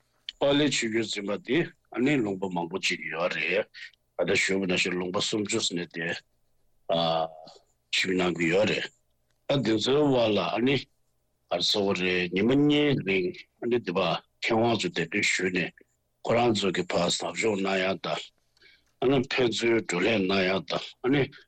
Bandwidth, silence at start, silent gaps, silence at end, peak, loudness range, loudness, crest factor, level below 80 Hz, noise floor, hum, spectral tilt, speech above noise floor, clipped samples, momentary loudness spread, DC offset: 9.4 kHz; 0.3 s; none; 0.1 s; -16 dBFS; 3 LU; -26 LUFS; 12 dB; -62 dBFS; -73 dBFS; none; -4.5 dB/octave; 47 dB; under 0.1%; 9 LU; under 0.1%